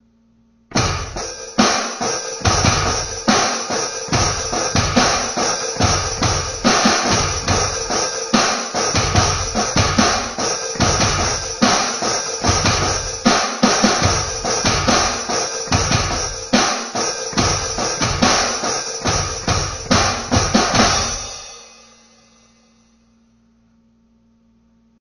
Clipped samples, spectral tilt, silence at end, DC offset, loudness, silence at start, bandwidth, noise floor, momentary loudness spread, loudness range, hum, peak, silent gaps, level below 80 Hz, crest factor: under 0.1%; -3 dB/octave; 3.3 s; under 0.1%; -17 LUFS; 0.7 s; 12.5 kHz; -56 dBFS; 6 LU; 2 LU; none; 0 dBFS; none; -34 dBFS; 18 dB